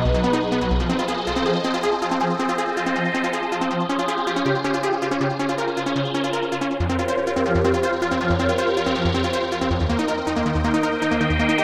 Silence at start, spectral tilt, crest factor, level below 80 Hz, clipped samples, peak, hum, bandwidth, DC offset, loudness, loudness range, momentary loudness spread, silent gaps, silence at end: 0 s; -5.5 dB/octave; 14 dB; -34 dBFS; under 0.1%; -6 dBFS; none; 14.5 kHz; under 0.1%; -22 LUFS; 1 LU; 3 LU; none; 0 s